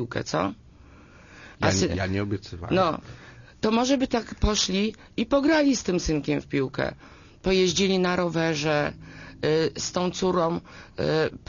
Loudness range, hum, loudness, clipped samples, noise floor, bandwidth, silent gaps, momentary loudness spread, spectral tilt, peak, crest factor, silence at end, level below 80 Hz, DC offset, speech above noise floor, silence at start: 3 LU; none; -25 LUFS; under 0.1%; -50 dBFS; 7.4 kHz; none; 10 LU; -4.5 dB/octave; -8 dBFS; 16 dB; 0.1 s; -42 dBFS; under 0.1%; 25 dB; 0 s